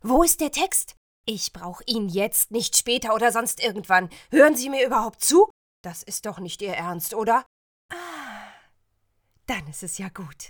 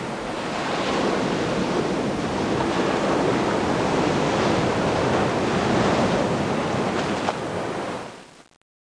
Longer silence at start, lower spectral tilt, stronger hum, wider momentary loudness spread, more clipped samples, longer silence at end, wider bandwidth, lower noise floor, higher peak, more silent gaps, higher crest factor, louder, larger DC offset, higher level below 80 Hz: about the same, 0.05 s vs 0 s; second, -2.5 dB/octave vs -5.5 dB/octave; neither; first, 19 LU vs 7 LU; neither; second, 0 s vs 0.45 s; first, over 20 kHz vs 10.5 kHz; first, -70 dBFS vs -43 dBFS; first, -2 dBFS vs -8 dBFS; first, 0.97-1.24 s, 5.50-5.84 s, 7.46-7.89 s vs none; first, 22 dB vs 16 dB; about the same, -22 LUFS vs -23 LUFS; neither; about the same, -48 dBFS vs -46 dBFS